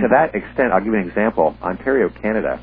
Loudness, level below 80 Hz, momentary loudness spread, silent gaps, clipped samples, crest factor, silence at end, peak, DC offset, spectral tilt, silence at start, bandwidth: -18 LUFS; -44 dBFS; 4 LU; none; under 0.1%; 18 dB; 0 s; 0 dBFS; under 0.1%; -11 dB/octave; 0 s; 4.8 kHz